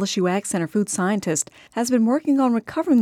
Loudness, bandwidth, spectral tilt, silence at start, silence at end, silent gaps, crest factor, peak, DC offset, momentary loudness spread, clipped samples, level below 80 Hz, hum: -22 LUFS; 16 kHz; -4.5 dB/octave; 0 s; 0 s; none; 14 dB; -8 dBFS; under 0.1%; 5 LU; under 0.1%; -64 dBFS; none